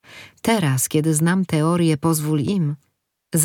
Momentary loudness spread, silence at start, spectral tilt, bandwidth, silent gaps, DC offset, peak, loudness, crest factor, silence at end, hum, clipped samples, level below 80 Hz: 7 LU; 0.1 s; -5 dB/octave; 19 kHz; none; under 0.1%; -2 dBFS; -20 LUFS; 18 dB; 0 s; none; under 0.1%; -58 dBFS